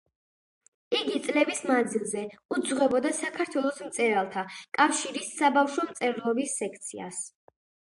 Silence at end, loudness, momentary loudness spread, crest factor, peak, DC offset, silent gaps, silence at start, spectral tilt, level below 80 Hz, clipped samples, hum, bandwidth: 0.65 s; -28 LUFS; 11 LU; 22 dB; -6 dBFS; under 0.1%; 2.45-2.49 s; 0.9 s; -2.5 dB/octave; -74 dBFS; under 0.1%; none; 11.5 kHz